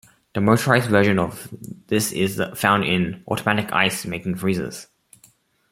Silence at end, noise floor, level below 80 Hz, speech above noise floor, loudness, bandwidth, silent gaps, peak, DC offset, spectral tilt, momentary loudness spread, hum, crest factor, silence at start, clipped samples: 0.85 s; -57 dBFS; -56 dBFS; 36 dB; -21 LUFS; 16.5 kHz; none; -2 dBFS; under 0.1%; -5 dB/octave; 14 LU; none; 20 dB; 0.35 s; under 0.1%